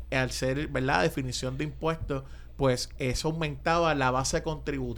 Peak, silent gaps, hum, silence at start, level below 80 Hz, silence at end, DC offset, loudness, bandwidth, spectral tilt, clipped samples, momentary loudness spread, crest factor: -10 dBFS; none; none; 0 s; -42 dBFS; 0 s; under 0.1%; -29 LUFS; 19 kHz; -4.5 dB/octave; under 0.1%; 8 LU; 20 dB